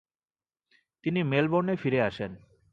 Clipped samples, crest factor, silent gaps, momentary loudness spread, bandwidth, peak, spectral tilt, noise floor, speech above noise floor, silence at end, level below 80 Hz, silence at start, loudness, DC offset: under 0.1%; 18 dB; none; 12 LU; 7.2 kHz; -12 dBFS; -8.5 dB/octave; under -90 dBFS; over 63 dB; 0.35 s; -62 dBFS; 1.05 s; -28 LUFS; under 0.1%